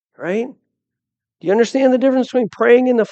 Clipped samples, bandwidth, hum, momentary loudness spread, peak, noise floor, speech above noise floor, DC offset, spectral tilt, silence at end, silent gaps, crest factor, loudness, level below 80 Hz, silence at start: under 0.1%; 8.4 kHz; none; 10 LU; 0 dBFS; -83 dBFS; 69 dB; under 0.1%; -5.5 dB/octave; 0.05 s; none; 16 dB; -15 LUFS; -76 dBFS; 0.2 s